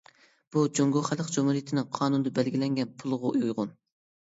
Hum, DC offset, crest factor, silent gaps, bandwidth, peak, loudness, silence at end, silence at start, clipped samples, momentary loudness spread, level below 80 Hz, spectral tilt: none; under 0.1%; 16 dB; none; 8 kHz; -12 dBFS; -28 LUFS; 0.55 s; 0.55 s; under 0.1%; 6 LU; -74 dBFS; -6 dB/octave